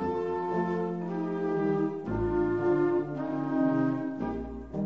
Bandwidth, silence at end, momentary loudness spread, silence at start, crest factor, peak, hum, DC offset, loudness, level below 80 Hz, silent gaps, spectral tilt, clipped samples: 6.4 kHz; 0 s; 7 LU; 0 s; 12 dB; -16 dBFS; none; 0.1%; -30 LUFS; -50 dBFS; none; -9.5 dB/octave; under 0.1%